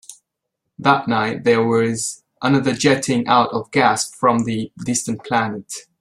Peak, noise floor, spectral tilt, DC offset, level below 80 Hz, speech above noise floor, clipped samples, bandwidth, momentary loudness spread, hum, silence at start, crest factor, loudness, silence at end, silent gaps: -2 dBFS; -78 dBFS; -4.5 dB/octave; under 0.1%; -58 dBFS; 60 dB; under 0.1%; 13.5 kHz; 8 LU; none; 0.1 s; 18 dB; -18 LUFS; 0.2 s; none